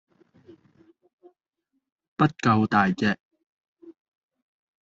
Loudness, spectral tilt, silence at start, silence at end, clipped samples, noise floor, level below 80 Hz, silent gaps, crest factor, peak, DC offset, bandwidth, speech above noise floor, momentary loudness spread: -23 LUFS; -5 dB/octave; 2.2 s; 0.9 s; under 0.1%; -78 dBFS; -64 dBFS; 3.20-3.31 s, 3.46-3.61 s, 3.68-3.76 s; 22 dB; -6 dBFS; under 0.1%; 7.6 kHz; 57 dB; 12 LU